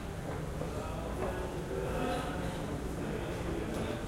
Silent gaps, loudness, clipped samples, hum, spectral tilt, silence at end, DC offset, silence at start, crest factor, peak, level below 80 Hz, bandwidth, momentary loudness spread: none; -37 LUFS; under 0.1%; none; -6 dB/octave; 0 s; under 0.1%; 0 s; 14 dB; -22 dBFS; -44 dBFS; 16 kHz; 4 LU